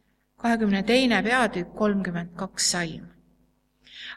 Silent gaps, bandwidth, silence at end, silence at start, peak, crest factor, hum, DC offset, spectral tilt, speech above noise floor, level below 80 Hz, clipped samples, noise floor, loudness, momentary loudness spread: none; 14 kHz; 0 s; 0.4 s; -6 dBFS; 20 dB; none; under 0.1%; -3.5 dB/octave; 42 dB; -54 dBFS; under 0.1%; -66 dBFS; -24 LUFS; 13 LU